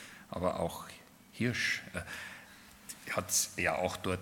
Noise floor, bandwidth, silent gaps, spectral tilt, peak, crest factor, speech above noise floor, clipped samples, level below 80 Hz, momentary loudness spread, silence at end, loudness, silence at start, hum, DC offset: -55 dBFS; 18 kHz; none; -3 dB/octave; -14 dBFS; 22 dB; 20 dB; under 0.1%; -66 dBFS; 20 LU; 0 s; -34 LUFS; 0 s; none; under 0.1%